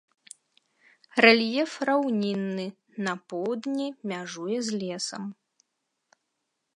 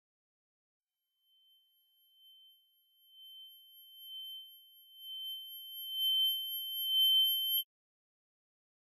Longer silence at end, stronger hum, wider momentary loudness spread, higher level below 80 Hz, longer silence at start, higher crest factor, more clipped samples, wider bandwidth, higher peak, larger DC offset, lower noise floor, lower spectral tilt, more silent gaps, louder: first, 1.45 s vs 1.25 s; neither; second, 16 LU vs 25 LU; first, -82 dBFS vs under -90 dBFS; second, 1.15 s vs 3.15 s; first, 26 dB vs 16 dB; neither; about the same, 11 kHz vs 12 kHz; first, -2 dBFS vs -22 dBFS; neither; about the same, -80 dBFS vs -82 dBFS; first, -4 dB/octave vs 7 dB/octave; neither; first, -26 LUFS vs -31 LUFS